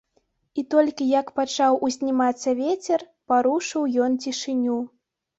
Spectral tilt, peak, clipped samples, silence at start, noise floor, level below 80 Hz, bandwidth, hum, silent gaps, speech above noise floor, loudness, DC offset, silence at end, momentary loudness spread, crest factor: -3 dB/octave; -8 dBFS; under 0.1%; 0.55 s; -69 dBFS; -70 dBFS; 8 kHz; none; none; 47 dB; -23 LUFS; under 0.1%; 0.5 s; 6 LU; 16 dB